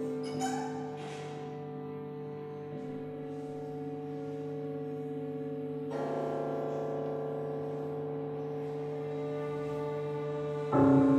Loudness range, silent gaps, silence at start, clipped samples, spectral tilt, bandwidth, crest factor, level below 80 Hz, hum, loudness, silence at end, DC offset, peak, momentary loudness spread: 4 LU; none; 0 s; under 0.1%; -7.5 dB/octave; 11.5 kHz; 20 dB; -68 dBFS; none; -36 LUFS; 0 s; under 0.1%; -14 dBFS; 7 LU